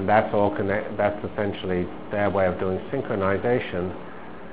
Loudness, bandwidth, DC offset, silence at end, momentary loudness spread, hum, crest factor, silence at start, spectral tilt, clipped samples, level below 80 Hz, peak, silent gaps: -25 LUFS; 4 kHz; 1%; 0 s; 8 LU; none; 20 dB; 0 s; -10.5 dB/octave; under 0.1%; -46 dBFS; -4 dBFS; none